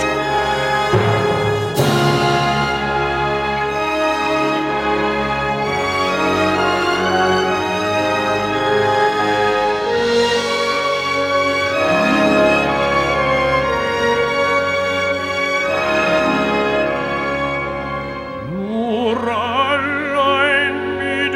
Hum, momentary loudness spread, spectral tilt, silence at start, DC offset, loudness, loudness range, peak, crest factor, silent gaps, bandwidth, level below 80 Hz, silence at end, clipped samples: none; 4 LU; -5 dB/octave; 0 s; under 0.1%; -17 LUFS; 3 LU; -2 dBFS; 16 dB; none; 16.5 kHz; -40 dBFS; 0 s; under 0.1%